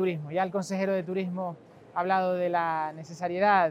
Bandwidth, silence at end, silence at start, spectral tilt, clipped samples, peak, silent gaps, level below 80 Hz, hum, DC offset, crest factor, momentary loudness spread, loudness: 13 kHz; 0 s; 0 s; -6.5 dB/octave; under 0.1%; -10 dBFS; none; -76 dBFS; none; under 0.1%; 18 dB; 10 LU; -29 LUFS